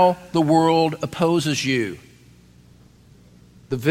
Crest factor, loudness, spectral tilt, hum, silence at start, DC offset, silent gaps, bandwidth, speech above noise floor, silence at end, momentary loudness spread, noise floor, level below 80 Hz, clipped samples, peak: 16 dB; -20 LUFS; -5.5 dB/octave; 60 Hz at -55 dBFS; 0 s; under 0.1%; none; 16.5 kHz; 31 dB; 0 s; 13 LU; -50 dBFS; -54 dBFS; under 0.1%; -6 dBFS